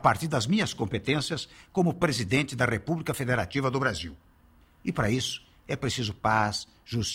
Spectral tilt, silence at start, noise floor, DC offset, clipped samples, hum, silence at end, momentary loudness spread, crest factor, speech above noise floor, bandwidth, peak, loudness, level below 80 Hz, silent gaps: -5 dB/octave; 0 s; -59 dBFS; under 0.1%; under 0.1%; none; 0 s; 10 LU; 20 dB; 31 dB; 16 kHz; -8 dBFS; -28 LUFS; -52 dBFS; none